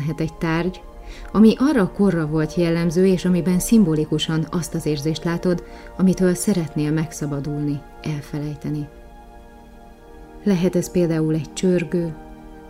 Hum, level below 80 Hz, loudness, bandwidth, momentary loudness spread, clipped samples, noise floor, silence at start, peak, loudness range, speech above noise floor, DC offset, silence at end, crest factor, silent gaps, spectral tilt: none; -42 dBFS; -21 LUFS; 16 kHz; 13 LU; under 0.1%; -43 dBFS; 0 s; -4 dBFS; 9 LU; 23 dB; under 0.1%; 0 s; 18 dB; none; -6.5 dB/octave